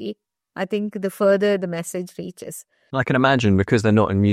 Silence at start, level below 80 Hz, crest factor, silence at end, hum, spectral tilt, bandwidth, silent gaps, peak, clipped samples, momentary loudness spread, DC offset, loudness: 0 s; -58 dBFS; 20 dB; 0 s; none; -6.5 dB/octave; 15 kHz; none; -2 dBFS; under 0.1%; 18 LU; under 0.1%; -20 LUFS